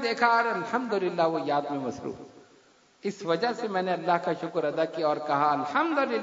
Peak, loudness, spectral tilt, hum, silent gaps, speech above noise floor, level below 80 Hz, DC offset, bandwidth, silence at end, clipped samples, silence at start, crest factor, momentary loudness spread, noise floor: -8 dBFS; -27 LUFS; -5.5 dB/octave; none; none; 33 dB; -74 dBFS; under 0.1%; 7.8 kHz; 0 s; under 0.1%; 0 s; 20 dB; 10 LU; -60 dBFS